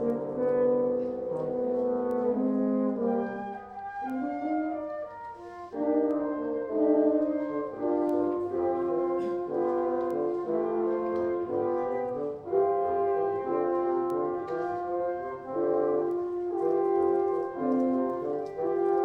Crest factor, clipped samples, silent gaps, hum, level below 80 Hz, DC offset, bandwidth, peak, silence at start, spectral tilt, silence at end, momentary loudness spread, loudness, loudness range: 16 dB; under 0.1%; none; none; -66 dBFS; under 0.1%; 5.2 kHz; -14 dBFS; 0 s; -9.5 dB/octave; 0 s; 7 LU; -29 LUFS; 3 LU